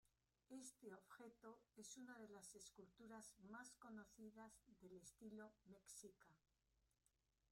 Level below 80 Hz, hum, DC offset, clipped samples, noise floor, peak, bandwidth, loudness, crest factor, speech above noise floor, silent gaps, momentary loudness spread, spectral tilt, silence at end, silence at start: -88 dBFS; none; under 0.1%; under 0.1%; -87 dBFS; -48 dBFS; 16 kHz; -63 LUFS; 16 dB; 24 dB; none; 6 LU; -3.5 dB/octave; 0.05 s; 0.05 s